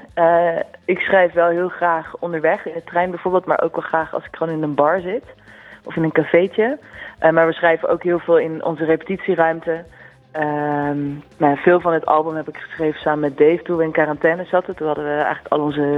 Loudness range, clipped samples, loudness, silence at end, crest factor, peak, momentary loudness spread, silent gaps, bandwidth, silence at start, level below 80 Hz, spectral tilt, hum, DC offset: 3 LU; under 0.1%; -18 LUFS; 0 s; 18 dB; 0 dBFS; 10 LU; none; 4.6 kHz; 0.15 s; -56 dBFS; -8.5 dB/octave; none; under 0.1%